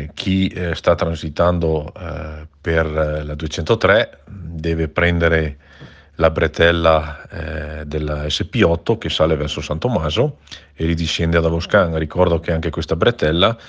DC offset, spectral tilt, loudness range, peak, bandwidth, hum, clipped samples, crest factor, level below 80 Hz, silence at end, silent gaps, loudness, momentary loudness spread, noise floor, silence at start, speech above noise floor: under 0.1%; -6 dB/octave; 2 LU; 0 dBFS; 8.2 kHz; none; under 0.1%; 18 dB; -32 dBFS; 0 s; none; -18 LUFS; 13 LU; -42 dBFS; 0 s; 24 dB